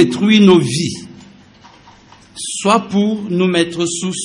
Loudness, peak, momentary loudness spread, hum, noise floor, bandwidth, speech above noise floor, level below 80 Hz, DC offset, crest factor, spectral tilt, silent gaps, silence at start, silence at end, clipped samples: -14 LUFS; 0 dBFS; 14 LU; none; -44 dBFS; 11 kHz; 30 dB; -56 dBFS; under 0.1%; 16 dB; -5 dB/octave; none; 0 s; 0 s; under 0.1%